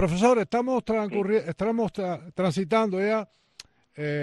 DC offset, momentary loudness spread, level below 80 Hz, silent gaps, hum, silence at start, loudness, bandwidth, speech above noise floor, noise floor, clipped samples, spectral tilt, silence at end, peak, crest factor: under 0.1%; 10 LU; -56 dBFS; none; none; 0 s; -26 LUFS; 11.5 kHz; 27 dB; -52 dBFS; under 0.1%; -6.5 dB/octave; 0 s; -8 dBFS; 18 dB